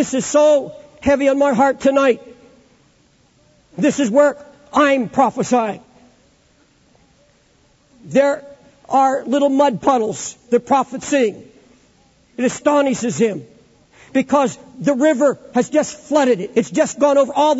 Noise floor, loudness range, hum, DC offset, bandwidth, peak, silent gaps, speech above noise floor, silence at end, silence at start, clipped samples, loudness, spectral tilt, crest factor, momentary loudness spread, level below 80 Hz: -56 dBFS; 4 LU; none; under 0.1%; 8 kHz; -2 dBFS; none; 40 dB; 0 s; 0 s; under 0.1%; -17 LUFS; -4.5 dB/octave; 14 dB; 8 LU; -54 dBFS